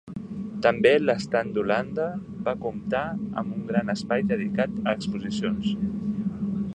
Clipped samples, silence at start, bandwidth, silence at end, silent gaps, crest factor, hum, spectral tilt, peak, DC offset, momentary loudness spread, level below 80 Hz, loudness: under 0.1%; 0.05 s; 9.6 kHz; 0 s; none; 20 dB; none; -6.5 dB/octave; -6 dBFS; under 0.1%; 10 LU; -54 dBFS; -26 LUFS